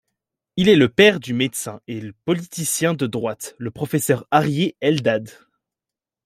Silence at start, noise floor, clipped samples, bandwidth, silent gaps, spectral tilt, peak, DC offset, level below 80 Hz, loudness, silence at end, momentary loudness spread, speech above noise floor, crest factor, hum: 0.55 s; -88 dBFS; under 0.1%; 16 kHz; none; -4.5 dB/octave; -2 dBFS; under 0.1%; -58 dBFS; -19 LUFS; 0.95 s; 15 LU; 69 dB; 18 dB; none